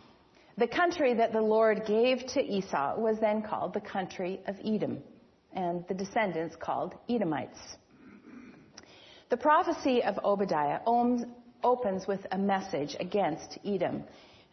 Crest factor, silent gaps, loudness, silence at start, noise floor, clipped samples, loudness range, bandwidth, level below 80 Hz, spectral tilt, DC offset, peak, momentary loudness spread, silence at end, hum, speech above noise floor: 18 dB; none; -30 LUFS; 0.55 s; -60 dBFS; under 0.1%; 6 LU; 6.4 kHz; -70 dBFS; -5.5 dB/octave; under 0.1%; -14 dBFS; 11 LU; 0.4 s; none; 30 dB